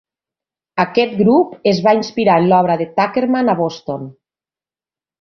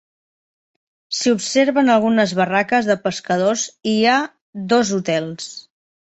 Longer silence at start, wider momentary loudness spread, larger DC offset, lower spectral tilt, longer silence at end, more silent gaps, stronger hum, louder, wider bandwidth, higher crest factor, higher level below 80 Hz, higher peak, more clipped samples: second, 0.75 s vs 1.1 s; about the same, 13 LU vs 14 LU; neither; first, -7 dB/octave vs -4 dB/octave; first, 1.1 s vs 0.45 s; second, none vs 4.41-4.53 s; neither; first, -15 LUFS vs -18 LUFS; second, 6.8 kHz vs 8.2 kHz; about the same, 16 dB vs 16 dB; about the same, -58 dBFS vs -62 dBFS; about the same, 0 dBFS vs -2 dBFS; neither